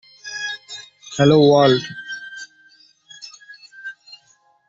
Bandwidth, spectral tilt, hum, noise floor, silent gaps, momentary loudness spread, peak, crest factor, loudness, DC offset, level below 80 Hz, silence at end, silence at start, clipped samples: 7.8 kHz; -5.5 dB/octave; none; -58 dBFS; none; 25 LU; -2 dBFS; 18 dB; -16 LUFS; under 0.1%; -58 dBFS; 0.8 s; 0.25 s; under 0.1%